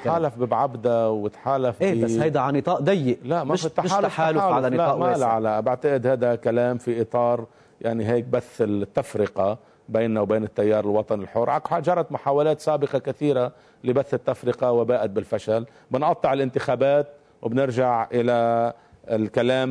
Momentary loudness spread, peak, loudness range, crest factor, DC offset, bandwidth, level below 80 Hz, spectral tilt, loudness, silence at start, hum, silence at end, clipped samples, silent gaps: 6 LU; -8 dBFS; 2 LU; 14 dB; under 0.1%; 11 kHz; -62 dBFS; -7 dB/octave; -23 LUFS; 0 s; none; 0 s; under 0.1%; none